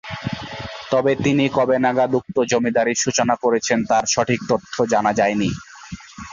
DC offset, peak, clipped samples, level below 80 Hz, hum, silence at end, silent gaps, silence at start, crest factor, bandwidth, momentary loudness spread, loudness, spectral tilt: under 0.1%; -4 dBFS; under 0.1%; -50 dBFS; none; 0 s; none; 0.05 s; 16 dB; 7.8 kHz; 13 LU; -19 LUFS; -4 dB/octave